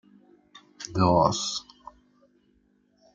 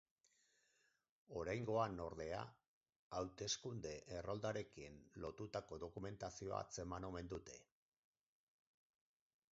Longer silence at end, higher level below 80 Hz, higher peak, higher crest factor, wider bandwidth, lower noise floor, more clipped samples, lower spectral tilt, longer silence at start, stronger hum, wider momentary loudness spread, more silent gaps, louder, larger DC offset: second, 1.55 s vs 1.9 s; first, -58 dBFS vs -68 dBFS; first, -8 dBFS vs -28 dBFS; about the same, 22 dB vs 22 dB; first, 9.2 kHz vs 7.6 kHz; second, -66 dBFS vs -82 dBFS; neither; about the same, -5 dB/octave vs -4.5 dB/octave; second, 0.8 s vs 1.3 s; neither; first, 20 LU vs 11 LU; second, none vs 2.68-2.81 s, 2.96-3.11 s; first, -25 LUFS vs -48 LUFS; neither